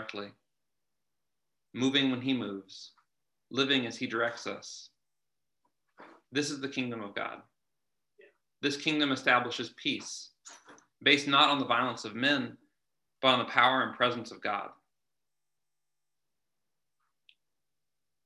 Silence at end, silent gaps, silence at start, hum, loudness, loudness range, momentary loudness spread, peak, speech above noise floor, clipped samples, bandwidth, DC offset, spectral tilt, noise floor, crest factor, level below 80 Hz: 3.55 s; none; 0 s; none; -29 LUFS; 11 LU; 18 LU; -6 dBFS; 60 dB; under 0.1%; 11.5 kHz; under 0.1%; -3.5 dB/octave; -90 dBFS; 28 dB; -80 dBFS